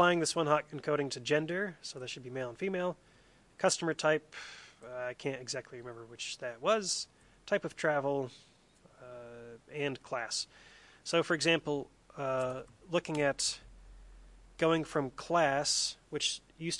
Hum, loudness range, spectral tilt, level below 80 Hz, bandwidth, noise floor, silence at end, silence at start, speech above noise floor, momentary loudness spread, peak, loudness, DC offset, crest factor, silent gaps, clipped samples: none; 5 LU; -3.5 dB/octave; -66 dBFS; 11.5 kHz; -64 dBFS; 0 s; 0 s; 30 dB; 17 LU; -12 dBFS; -33 LUFS; under 0.1%; 22 dB; none; under 0.1%